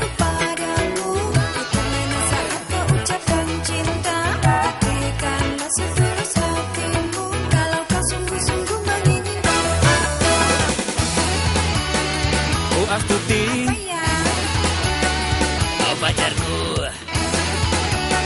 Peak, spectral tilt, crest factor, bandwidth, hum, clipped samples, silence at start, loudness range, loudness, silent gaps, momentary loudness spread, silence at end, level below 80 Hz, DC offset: -4 dBFS; -4 dB/octave; 16 dB; 11.5 kHz; none; under 0.1%; 0 s; 2 LU; -20 LUFS; none; 5 LU; 0 s; -30 dBFS; under 0.1%